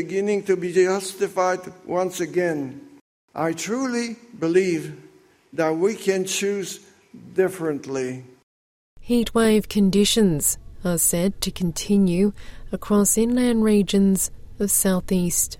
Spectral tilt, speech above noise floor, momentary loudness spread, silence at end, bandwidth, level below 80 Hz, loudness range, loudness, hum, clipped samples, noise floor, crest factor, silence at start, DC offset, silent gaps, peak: -4.5 dB/octave; over 69 dB; 11 LU; 0.05 s; 16.5 kHz; -44 dBFS; 6 LU; -22 LUFS; none; under 0.1%; under -90 dBFS; 16 dB; 0 s; under 0.1%; 3.01-3.28 s, 8.43-8.97 s; -6 dBFS